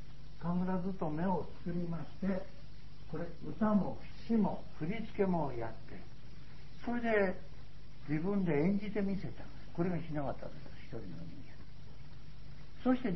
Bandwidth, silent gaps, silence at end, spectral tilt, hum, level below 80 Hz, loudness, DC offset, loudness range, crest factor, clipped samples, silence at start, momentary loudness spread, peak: 6 kHz; none; 0 s; -7.5 dB/octave; none; -56 dBFS; -37 LUFS; 1%; 6 LU; 20 dB; under 0.1%; 0 s; 22 LU; -18 dBFS